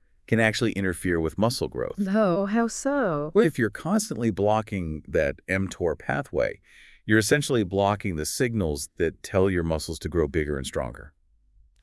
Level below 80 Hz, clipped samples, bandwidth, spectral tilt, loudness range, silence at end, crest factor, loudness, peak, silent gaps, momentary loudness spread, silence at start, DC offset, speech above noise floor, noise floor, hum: -46 dBFS; under 0.1%; 12 kHz; -5.5 dB/octave; 2 LU; 0.75 s; 20 dB; -25 LUFS; -6 dBFS; none; 7 LU; 0.3 s; under 0.1%; 35 dB; -60 dBFS; none